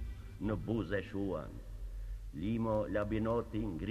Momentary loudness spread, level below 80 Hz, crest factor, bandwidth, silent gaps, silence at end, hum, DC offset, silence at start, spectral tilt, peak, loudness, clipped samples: 13 LU; -46 dBFS; 16 dB; 13.5 kHz; none; 0 s; none; under 0.1%; 0 s; -8.5 dB/octave; -20 dBFS; -38 LUFS; under 0.1%